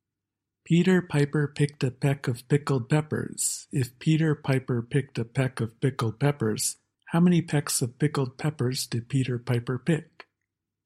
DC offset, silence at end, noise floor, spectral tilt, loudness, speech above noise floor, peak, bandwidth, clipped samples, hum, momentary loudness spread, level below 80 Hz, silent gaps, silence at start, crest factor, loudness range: under 0.1%; 0.8 s; -87 dBFS; -5.5 dB/octave; -27 LUFS; 61 dB; -10 dBFS; 14.5 kHz; under 0.1%; none; 7 LU; -62 dBFS; none; 0.7 s; 18 dB; 1 LU